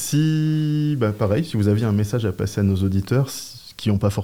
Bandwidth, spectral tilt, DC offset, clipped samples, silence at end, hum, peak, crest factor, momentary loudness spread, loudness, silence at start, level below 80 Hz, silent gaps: 16.5 kHz; -6.5 dB/octave; 0.2%; under 0.1%; 0 s; none; -8 dBFS; 12 dB; 5 LU; -21 LUFS; 0 s; -52 dBFS; none